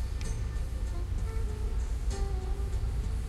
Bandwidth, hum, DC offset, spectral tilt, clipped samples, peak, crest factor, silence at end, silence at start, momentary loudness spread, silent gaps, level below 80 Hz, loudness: 12.5 kHz; none; under 0.1%; -6 dB/octave; under 0.1%; -20 dBFS; 12 dB; 0 s; 0 s; 2 LU; none; -32 dBFS; -35 LUFS